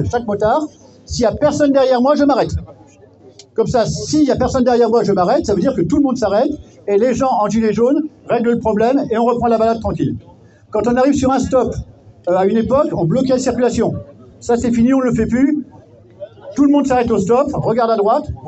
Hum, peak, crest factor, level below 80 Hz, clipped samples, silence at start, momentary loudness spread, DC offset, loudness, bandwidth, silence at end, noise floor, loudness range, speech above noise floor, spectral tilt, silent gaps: none; -2 dBFS; 12 dB; -40 dBFS; under 0.1%; 0 s; 9 LU; under 0.1%; -15 LUFS; 8.4 kHz; 0 s; -44 dBFS; 2 LU; 29 dB; -6.5 dB/octave; none